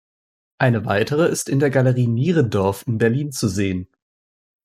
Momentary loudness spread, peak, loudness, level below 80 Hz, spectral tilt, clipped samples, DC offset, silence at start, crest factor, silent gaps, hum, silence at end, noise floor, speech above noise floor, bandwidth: 5 LU; -4 dBFS; -19 LUFS; -58 dBFS; -6 dB/octave; under 0.1%; under 0.1%; 0.6 s; 16 dB; none; none; 0.8 s; under -90 dBFS; over 72 dB; 15.5 kHz